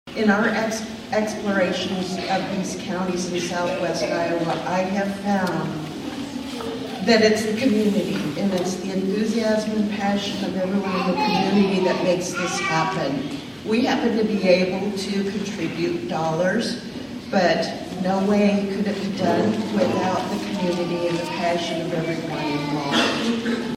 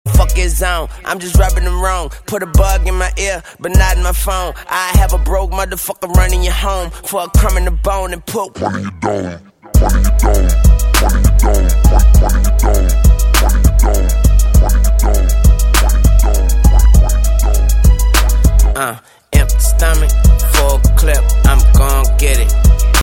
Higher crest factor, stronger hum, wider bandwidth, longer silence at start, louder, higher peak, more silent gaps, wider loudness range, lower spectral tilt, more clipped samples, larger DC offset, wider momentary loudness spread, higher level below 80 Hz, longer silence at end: first, 18 dB vs 10 dB; neither; about the same, 15.5 kHz vs 17 kHz; about the same, 0.05 s vs 0.05 s; second, -22 LUFS vs -13 LUFS; second, -4 dBFS vs 0 dBFS; neither; about the same, 3 LU vs 4 LU; about the same, -5 dB/octave vs -5 dB/octave; neither; neither; about the same, 8 LU vs 9 LU; second, -54 dBFS vs -10 dBFS; about the same, 0 s vs 0 s